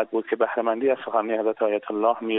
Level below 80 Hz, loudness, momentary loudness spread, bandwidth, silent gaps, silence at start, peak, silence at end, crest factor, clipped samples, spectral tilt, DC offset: -78 dBFS; -24 LUFS; 2 LU; 4 kHz; none; 0 s; -6 dBFS; 0 s; 16 dB; under 0.1%; -2.5 dB/octave; under 0.1%